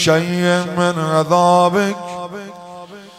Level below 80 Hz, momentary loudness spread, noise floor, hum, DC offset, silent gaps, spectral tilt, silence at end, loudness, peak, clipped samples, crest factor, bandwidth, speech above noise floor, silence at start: -60 dBFS; 21 LU; -36 dBFS; none; under 0.1%; none; -5 dB/octave; 0.1 s; -15 LUFS; -2 dBFS; under 0.1%; 14 dB; 15 kHz; 21 dB; 0 s